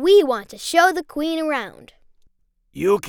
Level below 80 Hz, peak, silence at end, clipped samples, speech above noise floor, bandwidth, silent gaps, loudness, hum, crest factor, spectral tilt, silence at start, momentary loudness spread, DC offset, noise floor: -56 dBFS; -2 dBFS; 0 s; under 0.1%; 42 dB; 17.5 kHz; none; -20 LUFS; none; 18 dB; -3.5 dB/octave; 0 s; 10 LU; under 0.1%; -60 dBFS